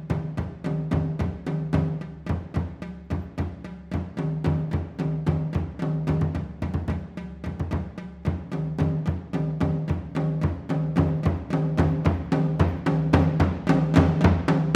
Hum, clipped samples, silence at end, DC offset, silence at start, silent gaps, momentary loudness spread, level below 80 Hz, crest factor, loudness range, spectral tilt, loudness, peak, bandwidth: none; under 0.1%; 0 s; under 0.1%; 0 s; none; 11 LU; -38 dBFS; 22 dB; 7 LU; -9 dB/octave; -26 LUFS; -2 dBFS; 8.4 kHz